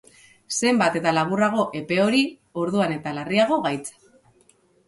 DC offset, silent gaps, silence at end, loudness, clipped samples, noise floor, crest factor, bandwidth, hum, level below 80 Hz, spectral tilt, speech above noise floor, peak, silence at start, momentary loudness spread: under 0.1%; none; 1 s; -22 LUFS; under 0.1%; -60 dBFS; 16 dB; 11.5 kHz; none; -64 dBFS; -4.5 dB/octave; 38 dB; -6 dBFS; 0.5 s; 9 LU